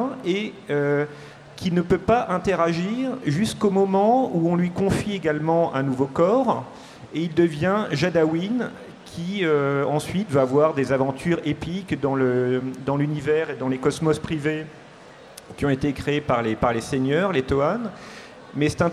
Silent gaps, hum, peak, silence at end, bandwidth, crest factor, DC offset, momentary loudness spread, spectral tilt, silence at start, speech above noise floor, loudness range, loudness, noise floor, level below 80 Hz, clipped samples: none; none; -6 dBFS; 0 s; 13.5 kHz; 16 dB; under 0.1%; 12 LU; -6.5 dB/octave; 0 s; 23 dB; 4 LU; -23 LUFS; -45 dBFS; -48 dBFS; under 0.1%